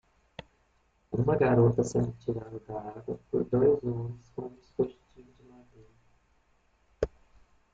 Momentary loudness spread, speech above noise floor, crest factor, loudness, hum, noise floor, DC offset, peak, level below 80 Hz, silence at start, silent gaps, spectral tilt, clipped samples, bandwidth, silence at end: 18 LU; 41 dB; 20 dB; -30 LUFS; none; -69 dBFS; under 0.1%; -12 dBFS; -54 dBFS; 0.4 s; none; -8.5 dB/octave; under 0.1%; 7.8 kHz; 0.65 s